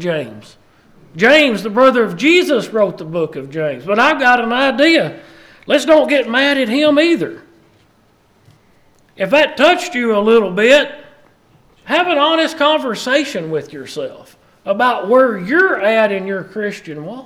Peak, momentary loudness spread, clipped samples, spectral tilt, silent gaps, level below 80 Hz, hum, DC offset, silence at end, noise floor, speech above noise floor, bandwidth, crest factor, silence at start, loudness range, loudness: 0 dBFS; 13 LU; under 0.1%; -4.5 dB/octave; none; -58 dBFS; none; under 0.1%; 0 s; -53 dBFS; 40 dB; 14.5 kHz; 14 dB; 0 s; 4 LU; -14 LUFS